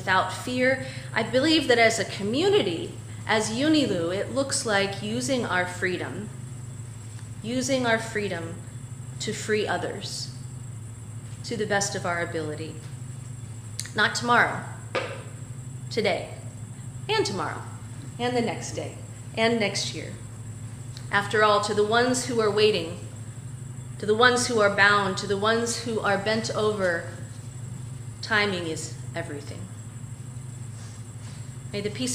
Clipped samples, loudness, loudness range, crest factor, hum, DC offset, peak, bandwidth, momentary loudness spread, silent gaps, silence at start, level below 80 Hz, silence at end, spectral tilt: under 0.1%; -25 LUFS; 8 LU; 24 dB; none; under 0.1%; -4 dBFS; 15.5 kHz; 18 LU; none; 0 s; -56 dBFS; 0 s; -4 dB/octave